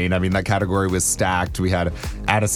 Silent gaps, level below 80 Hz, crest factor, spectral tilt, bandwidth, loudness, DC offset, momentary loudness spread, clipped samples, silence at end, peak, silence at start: none; -34 dBFS; 20 dB; -4.5 dB/octave; 16.5 kHz; -21 LUFS; under 0.1%; 4 LU; under 0.1%; 0 s; 0 dBFS; 0 s